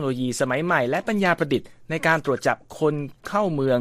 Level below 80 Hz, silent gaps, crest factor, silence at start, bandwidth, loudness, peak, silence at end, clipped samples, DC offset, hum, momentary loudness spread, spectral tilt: -58 dBFS; none; 18 dB; 0 s; 15 kHz; -23 LUFS; -4 dBFS; 0 s; under 0.1%; under 0.1%; none; 5 LU; -5.5 dB/octave